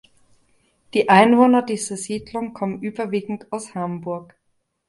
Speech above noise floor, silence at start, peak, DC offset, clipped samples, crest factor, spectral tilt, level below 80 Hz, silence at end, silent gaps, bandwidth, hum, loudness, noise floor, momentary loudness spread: 42 dB; 0.95 s; 0 dBFS; under 0.1%; under 0.1%; 20 dB; -5 dB/octave; -62 dBFS; 0.65 s; none; 11.5 kHz; none; -20 LUFS; -62 dBFS; 16 LU